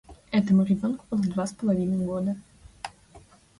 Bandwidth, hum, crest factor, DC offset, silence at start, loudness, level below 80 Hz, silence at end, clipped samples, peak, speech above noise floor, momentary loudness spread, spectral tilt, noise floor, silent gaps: 11.5 kHz; none; 14 dB; under 0.1%; 0.1 s; -26 LUFS; -56 dBFS; 0.4 s; under 0.1%; -12 dBFS; 29 dB; 19 LU; -7.5 dB/octave; -53 dBFS; none